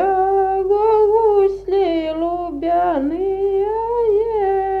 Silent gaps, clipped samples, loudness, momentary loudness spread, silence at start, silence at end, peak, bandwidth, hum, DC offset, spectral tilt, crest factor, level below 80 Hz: none; under 0.1%; -17 LUFS; 6 LU; 0 s; 0 s; -6 dBFS; 4.8 kHz; none; under 0.1%; -7.5 dB/octave; 12 dB; -42 dBFS